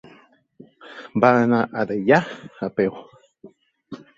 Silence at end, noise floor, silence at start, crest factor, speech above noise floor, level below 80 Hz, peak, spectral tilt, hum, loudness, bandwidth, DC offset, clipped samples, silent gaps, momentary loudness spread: 0.2 s; -53 dBFS; 0.85 s; 20 dB; 34 dB; -64 dBFS; -2 dBFS; -7.5 dB/octave; none; -20 LUFS; 7.4 kHz; under 0.1%; under 0.1%; none; 24 LU